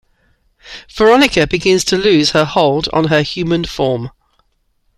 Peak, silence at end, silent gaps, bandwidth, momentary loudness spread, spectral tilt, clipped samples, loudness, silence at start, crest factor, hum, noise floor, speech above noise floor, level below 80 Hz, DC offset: 0 dBFS; 0.9 s; none; 15 kHz; 15 LU; -4.5 dB/octave; under 0.1%; -13 LUFS; 0.65 s; 14 dB; none; -61 dBFS; 48 dB; -40 dBFS; under 0.1%